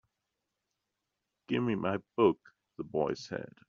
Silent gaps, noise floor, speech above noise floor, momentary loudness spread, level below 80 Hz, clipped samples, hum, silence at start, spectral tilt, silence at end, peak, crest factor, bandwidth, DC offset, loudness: none; -86 dBFS; 54 dB; 13 LU; -70 dBFS; under 0.1%; none; 1.5 s; -5.5 dB/octave; 0.2 s; -12 dBFS; 22 dB; 7.4 kHz; under 0.1%; -33 LUFS